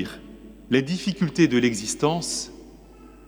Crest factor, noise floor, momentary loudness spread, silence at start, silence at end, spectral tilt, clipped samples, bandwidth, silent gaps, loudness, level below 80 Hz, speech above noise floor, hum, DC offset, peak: 18 dB; -47 dBFS; 17 LU; 0 s; 0.1 s; -4.5 dB/octave; under 0.1%; over 20 kHz; none; -23 LUFS; -52 dBFS; 24 dB; none; under 0.1%; -6 dBFS